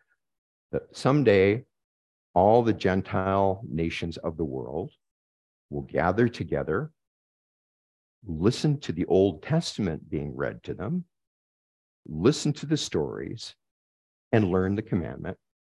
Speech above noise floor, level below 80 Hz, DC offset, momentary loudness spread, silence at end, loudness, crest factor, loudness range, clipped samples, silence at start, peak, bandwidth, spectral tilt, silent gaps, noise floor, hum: over 64 dB; -48 dBFS; under 0.1%; 14 LU; 0.35 s; -26 LUFS; 20 dB; 6 LU; under 0.1%; 0.75 s; -8 dBFS; 12 kHz; -6.5 dB/octave; 1.84-2.34 s, 5.11-5.69 s, 7.07-8.22 s, 11.27-12.03 s, 13.71-14.31 s; under -90 dBFS; none